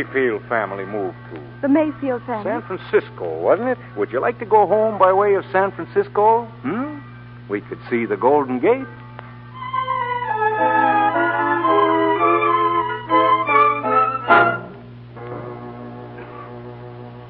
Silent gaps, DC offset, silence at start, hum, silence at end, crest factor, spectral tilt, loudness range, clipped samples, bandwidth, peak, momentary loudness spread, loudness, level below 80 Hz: none; under 0.1%; 0 s; 60 Hz at -40 dBFS; 0 s; 18 dB; -10.5 dB/octave; 5 LU; under 0.1%; 5 kHz; 0 dBFS; 20 LU; -18 LUFS; -56 dBFS